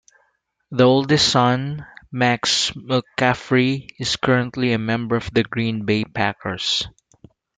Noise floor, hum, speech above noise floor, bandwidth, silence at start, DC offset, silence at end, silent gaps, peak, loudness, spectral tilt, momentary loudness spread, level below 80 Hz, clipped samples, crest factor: -66 dBFS; none; 47 dB; 9.4 kHz; 0.7 s; under 0.1%; 0.7 s; none; -2 dBFS; -19 LUFS; -4.5 dB/octave; 9 LU; -52 dBFS; under 0.1%; 18 dB